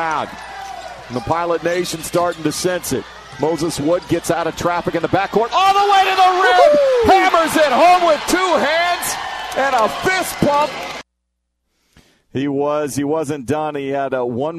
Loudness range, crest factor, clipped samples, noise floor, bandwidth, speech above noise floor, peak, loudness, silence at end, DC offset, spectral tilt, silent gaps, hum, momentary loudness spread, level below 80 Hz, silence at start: 9 LU; 16 dB; under 0.1%; -73 dBFS; 14 kHz; 57 dB; 0 dBFS; -16 LUFS; 0 s; under 0.1%; -4 dB/octave; none; none; 13 LU; -46 dBFS; 0 s